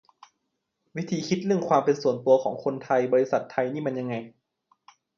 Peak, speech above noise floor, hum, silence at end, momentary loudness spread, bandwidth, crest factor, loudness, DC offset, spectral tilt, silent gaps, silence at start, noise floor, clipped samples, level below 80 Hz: -8 dBFS; 54 dB; none; 0.9 s; 10 LU; 7.2 kHz; 20 dB; -25 LUFS; under 0.1%; -6.5 dB/octave; none; 0.95 s; -79 dBFS; under 0.1%; -72 dBFS